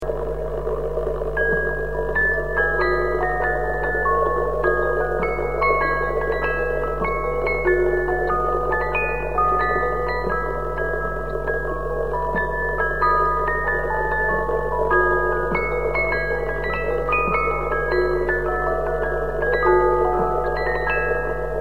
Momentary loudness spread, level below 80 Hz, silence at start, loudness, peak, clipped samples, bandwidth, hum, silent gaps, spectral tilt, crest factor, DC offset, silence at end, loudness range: 6 LU; -32 dBFS; 0 s; -21 LUFS; -4 dBFS; under 0.1%; 16 kHz; none; none; -7.5 dB/octave; 16 dB; 2%; 0 s; 2 LU